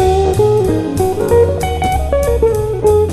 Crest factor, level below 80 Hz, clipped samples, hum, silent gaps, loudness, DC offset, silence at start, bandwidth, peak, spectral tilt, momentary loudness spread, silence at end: 12 dB; -22 dBFS; under 0.1%; none; none; -14 LUFS; under 0.1%; 0 s; 13.5 kHz; 0 dBFS; -6.5 dB/octave; 4 LU; 0 s